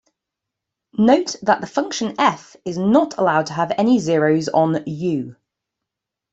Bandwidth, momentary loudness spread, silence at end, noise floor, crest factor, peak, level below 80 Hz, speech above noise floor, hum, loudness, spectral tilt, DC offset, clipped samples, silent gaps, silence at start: 8 kHz; 9 LU; 1 s; -83 dBFS; 18 dB; -2 dBFS; -62 dBFS; 65 dB; none; -19 LUFS; -5.5 dB/octave; under 0.1%; under 0.1%; none; 1 s